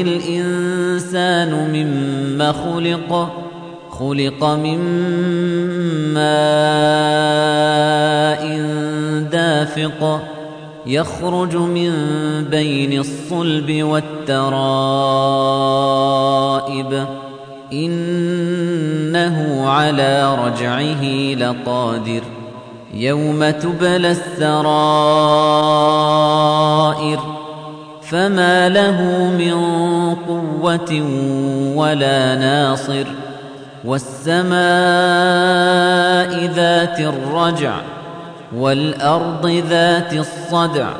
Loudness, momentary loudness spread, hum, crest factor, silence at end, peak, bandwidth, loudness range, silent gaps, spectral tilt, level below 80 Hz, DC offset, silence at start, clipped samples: -16 LUFS; 10 LU; none; 14 dB; 0 s; -2 dBFS; 10.5 kHz; 5 LU; none; -5.5 dB/octave; -56 dBFS; under 0.1%; 0 s; under 0.1%